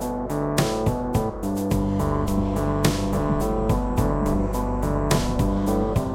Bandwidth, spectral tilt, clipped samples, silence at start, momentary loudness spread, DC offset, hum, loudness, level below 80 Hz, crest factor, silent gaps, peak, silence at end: 17 kHz; -6.5 dB/octave; under 0.1%; 0 s; 3 LU; under 0.1%; none; -24 LUFS; -30 dBFS; 18 dB; none; -4 dBFS; 0 s